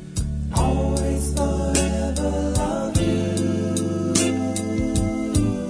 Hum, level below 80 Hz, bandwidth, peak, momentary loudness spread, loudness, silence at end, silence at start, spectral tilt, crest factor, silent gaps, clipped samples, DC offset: none; -28 dBFS; 11 kHz; -4 dBFS; 3 LU; -22 LUFS; 0 s; 0 s; -5.5 dB/octave; 18 dB; none; under 0.1%; under 0.1%